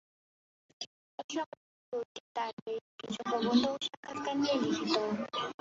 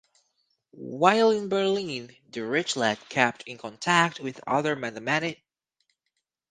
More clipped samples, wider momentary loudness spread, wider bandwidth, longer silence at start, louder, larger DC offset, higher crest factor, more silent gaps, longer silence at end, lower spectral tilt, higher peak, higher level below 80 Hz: neither; about the same, 15 LU vs 15 LU; second, 7.8 kHz vs 9.8 kHz; about the same, 0.8 s vs 0.75 s; second, -34 LUFS vs -25 LUFS; neither; about the same, 22 dB vs 24 dB; first, 0.87-1.18 s, 1.24-1.29 s, 1.46-1.92 s, 2.05-2.35 s, 2.53-2.66 s, 2.81-2.98 s, 3.97-4.03 s vs none; second, 0.1 s vs 1.15 s; about the same, -4 dB/octave vs -4 dB/octave; second, -14 dBFS vs -4 dBFS; about the same, -76 dBFS vs -72 dBFS